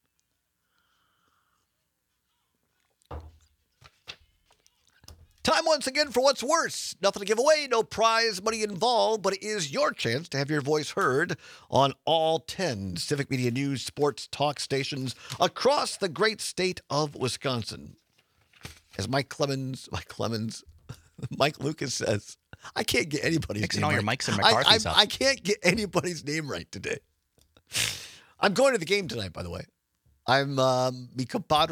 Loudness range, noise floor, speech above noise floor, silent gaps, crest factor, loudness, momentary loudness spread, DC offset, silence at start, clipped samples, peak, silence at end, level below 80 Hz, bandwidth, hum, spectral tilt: 8 LU; -77 dBFS; 51 dB; none; 26 dB; -26 LUFS; 15 LU; under 0.1%; 3.1 s; under 0.1%; -2 dBFS; 0 s; -60 dBFS; 19 kHz; none; -3.5 dB/octave